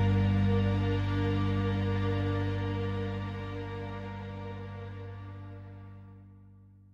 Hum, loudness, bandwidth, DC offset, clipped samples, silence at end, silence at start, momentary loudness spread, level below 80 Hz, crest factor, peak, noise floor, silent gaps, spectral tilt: 50 Hz at -65 dBFS; -32 LUFS; 5.8 kHz; under 0.1%; under 0.1%; 0.25 s; 0 s; 19 LU; -46 dBFS; 16 dB; -16 dBFS; -55 dBFS; none; -8.5 dB/octave